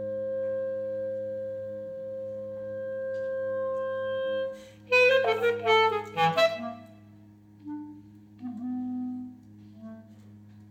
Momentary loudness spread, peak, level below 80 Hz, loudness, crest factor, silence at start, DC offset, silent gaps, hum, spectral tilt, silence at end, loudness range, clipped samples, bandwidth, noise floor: 22 LU; -10 dBFS; -74 dBFS; -28 LUFS; 20 dB; 0 s; under 0.1%; none; none; -4.5 dB/octave; 0 s; 14 LU; under 0.1%; 15 kHz; -53 dBFS